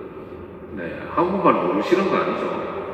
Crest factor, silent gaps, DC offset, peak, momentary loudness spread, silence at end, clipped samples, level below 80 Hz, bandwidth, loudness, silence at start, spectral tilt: 20 dB; none; under 0.1%; -2 dBFS; 18 LU; 0 s; under 0.1%; -56 dBFS; 8.8 kHz; -21 LUFS; 0 s; -7 dB/octave